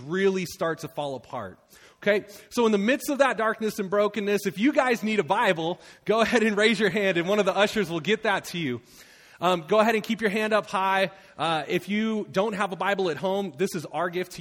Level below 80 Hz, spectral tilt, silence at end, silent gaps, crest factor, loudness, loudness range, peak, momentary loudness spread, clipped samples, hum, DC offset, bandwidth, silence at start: -64 dBFS; -4.5 dB/octave; 0 s; none; 18 dB; -25 LUFS; 3 LU; -6 dBFS; 9 LU; under 0.1%; none; under 0.1%; 17.5 kHz; 0 s